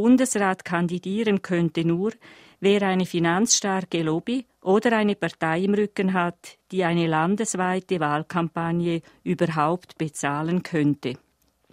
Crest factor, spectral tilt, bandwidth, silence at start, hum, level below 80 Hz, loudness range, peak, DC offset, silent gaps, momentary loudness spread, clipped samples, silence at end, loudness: 18 dB; -5 dB/octave; 15.5 kHz; 0 s; none; -64 dBFS; 3 LU; -6 dBFS; under 0.1%; none; 8 LU; under 0.1%; 0.55 s; -24 LUFS